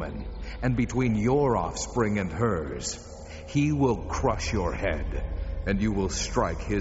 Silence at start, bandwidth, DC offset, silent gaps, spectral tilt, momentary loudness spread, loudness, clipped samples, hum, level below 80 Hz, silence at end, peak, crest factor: 0 s; 8 kHz; under 0.1%; none; -6 dB/octave; 10 LU; -27 LUFS; under 0.1%; none; -36 dBFS; 0 s; -10 dBFS; 16 dB